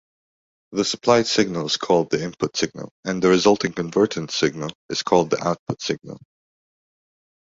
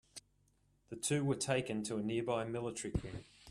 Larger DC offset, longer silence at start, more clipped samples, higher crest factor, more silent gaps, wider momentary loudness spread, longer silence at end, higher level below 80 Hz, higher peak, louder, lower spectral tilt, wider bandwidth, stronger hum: neither; first, 0.7 s vs 0.15 s; neither; about the same, 20 dB vs 18 dB; first, 2.91-3.03 s, 4.75-4.89 s, 5.59-5.66 s vs none; second, 11 LU vs 17 LU; first, 1.4 s vs 0 s; about the same, -58 dBFS vs -58 dBFS; first, -2 dBFS vs -20 dBFS; first, -21 LUFS vs -38 LUFS; about the same, -4.5 dB/octave vs -5 dB/octave; second, 8 kHz vs 14 kHz; neither